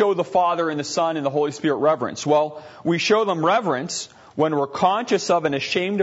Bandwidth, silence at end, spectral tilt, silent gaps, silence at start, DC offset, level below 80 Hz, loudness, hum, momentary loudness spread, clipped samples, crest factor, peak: 8 kHz; 0 s; -4.5 dB/octave; none; 0 s; under 0.1%; -66 dBFS; -21 LUFS; none; 6 LU; under 0.1%; 16 dB; -4 dBFS